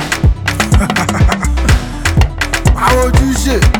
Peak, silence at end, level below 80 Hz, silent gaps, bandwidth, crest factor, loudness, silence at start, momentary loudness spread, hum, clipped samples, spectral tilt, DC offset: 0 dBFS; 0 s; -14 dBFS; none; 19.5 kHz; 10 dB; -12 LUFS; 0 s; 3 LU; none; under 0.1%; -5 dB/octave; under 0.1%